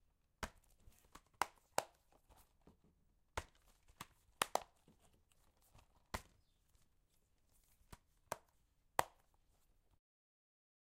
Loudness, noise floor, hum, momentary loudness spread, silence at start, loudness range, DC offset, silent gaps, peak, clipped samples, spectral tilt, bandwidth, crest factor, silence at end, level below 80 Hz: -46 LUFS; -77 dBFS; none; 23 LU; 0.4 s; 8 LU; under 0.1%; none; -14 dBFS; under 0.1%; -2 dB/octave; 16 kHz; 38 dB; 1.9 s; -68 dBFS